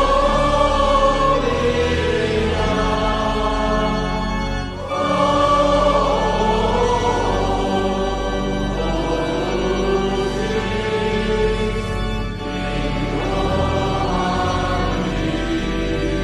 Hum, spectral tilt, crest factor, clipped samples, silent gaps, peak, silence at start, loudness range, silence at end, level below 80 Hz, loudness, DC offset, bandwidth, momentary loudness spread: none; -5.5 dB/octave; 14 dB; under 0.1%; none; -4 dBFS; 0 s; 4 LU; 0 s; -26 dBFS; -19 LUFS; under 0.1%; 11.5 kHz; 7 LU